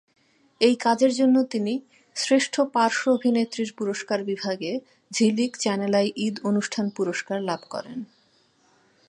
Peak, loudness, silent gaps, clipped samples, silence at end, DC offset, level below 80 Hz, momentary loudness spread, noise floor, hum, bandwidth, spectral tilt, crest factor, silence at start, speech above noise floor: -6 dBFS; -24 LUFS; none; under 0.1%; 1.05 s; under 0.1%; -76 dBFS; 12 LU; -63 dBFS; none; 11 kHz; -4.5 dB/octave; 20 dB; 0.6 s; 39 dB